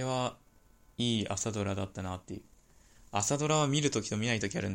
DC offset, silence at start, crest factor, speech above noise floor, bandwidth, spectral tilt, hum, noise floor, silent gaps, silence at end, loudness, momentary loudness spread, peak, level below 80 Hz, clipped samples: under 0.1%; 0 s; 18 dB; 31 dB; 16.5 kHz; -4 dB/octave; none; -62 dBFS; none; 0 s; -32 LUFS; 13 LU; -14 dBFS; -60 dBFS; under 0.1%